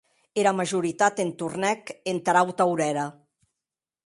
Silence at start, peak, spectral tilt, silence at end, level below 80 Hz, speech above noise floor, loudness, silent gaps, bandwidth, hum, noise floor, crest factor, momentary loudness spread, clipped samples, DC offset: 0.35 s; -6 dBFS; -4.5 dB/octave; 0.95 s; -72 dBFS; 65 dB; -25 LUFS; none; 11.5 kHz; none; -89 dBFS; 20 dB; 9 LU; under 0.1%; under 0.1%